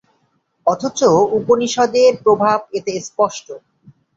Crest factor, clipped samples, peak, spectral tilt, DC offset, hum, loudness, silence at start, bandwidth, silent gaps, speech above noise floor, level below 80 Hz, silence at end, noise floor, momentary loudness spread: 16 dB; under 0.1%; -2 dBFS; -4.5 dB/octave; under 0.1%; none; -16 LUFS; 0.65 s; 7.8 kHz; none; 48 dB; -58 dBFS; 0.6 s; -64 dBFS; 11 LU